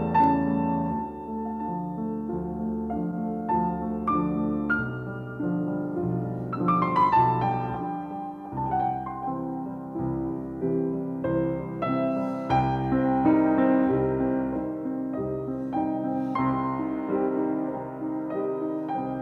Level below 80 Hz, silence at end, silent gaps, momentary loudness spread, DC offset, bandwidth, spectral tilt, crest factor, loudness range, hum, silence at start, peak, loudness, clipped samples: -50 dBFS; 0 s; none; 10 LU; under 0.1%; 5.6 kHz; -10 dB/octave; 16 dB; 5 LU; none; 0 s; -12 dBFS; -27 LUFS; under 0.1%